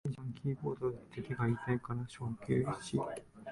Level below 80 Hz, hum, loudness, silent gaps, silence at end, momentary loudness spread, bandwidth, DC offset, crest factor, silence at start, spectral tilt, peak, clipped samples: -62 dBFS; none; -38 LUFS; none; 0 s; 8 LU; 11.5 kHz; under 0.1%; 18 dB; 0.05 s; -7.5 dB/octave; -20 dBFS; under 0.1%